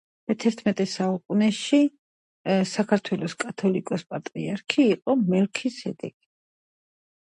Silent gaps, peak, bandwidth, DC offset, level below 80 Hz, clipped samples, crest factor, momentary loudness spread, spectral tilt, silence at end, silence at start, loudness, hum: 1.99-2.45 s; -4 dBFS; 10.5 kHz; under 0.1%; -70 dBFS; under 0.1%; 20 dB; 11 LU; -6 dB/octave; 1.3 s; 0.3 s; -25 LUFS; none